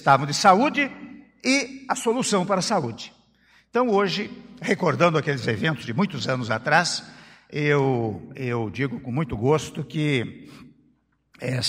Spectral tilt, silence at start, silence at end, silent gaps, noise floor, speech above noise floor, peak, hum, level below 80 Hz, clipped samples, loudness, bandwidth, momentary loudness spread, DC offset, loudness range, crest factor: -5 dB/octave; 0 s; 0 s; none; -65 dBFS; 42 dB; -4 dBFS; none; -56 dBFS; under 0.1%; -23 LUFS; 15.5 kHz; 13 LU; under 0.1%; 3 LU; 20 dB